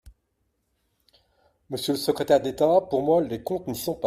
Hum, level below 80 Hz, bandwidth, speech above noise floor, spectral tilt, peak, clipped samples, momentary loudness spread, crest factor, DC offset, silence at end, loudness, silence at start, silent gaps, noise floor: none; -58 dBFS; 16 kHz; 51 dB; -5.5 dB/octave; -6 dBFS; under 0.1%; 9 LU; 20 dB; under 0.1%; 0 s; -24 LUFS; 0.05 s; none; -74 dBFS